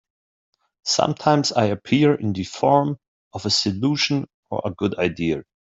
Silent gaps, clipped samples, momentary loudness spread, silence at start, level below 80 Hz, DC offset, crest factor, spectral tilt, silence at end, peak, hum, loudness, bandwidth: 3.08-3.31 s, 4.34-4.43 s; under 0.1%; 11 LU; 0.85 s; -58 dBFS; under 0.1%; 20 dB; -5 dB/octave; 0.3 s; -2 dBFS; none; -21 LUFS; 8 kHz